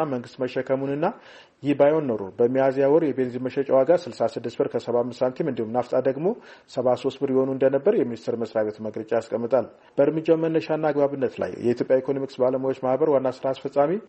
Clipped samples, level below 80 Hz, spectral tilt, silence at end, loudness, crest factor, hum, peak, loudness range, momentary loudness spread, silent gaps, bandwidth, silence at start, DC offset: under 0.1%; -68 dBFS; -7.5 dB/octave; 0.05 s; -24 LUFS; 16 dB; none; -6 dBFS; 3 LU; 8 LU; none; 8.4 kHz; 0 s; under 0.1%